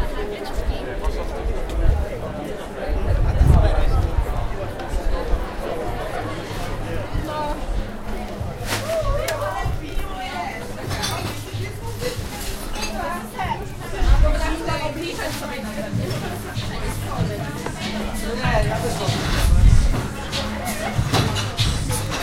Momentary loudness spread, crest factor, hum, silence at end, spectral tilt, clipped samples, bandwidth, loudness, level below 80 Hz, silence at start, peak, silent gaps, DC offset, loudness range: 9 LU; 18 dB; none; 0 s; -5 dB/octave; under 0.1%; 16.5 kHz; -24 LUFS; -24 dBFS; 0 s; -2 dBFS; none; under 0.1%; 6 LU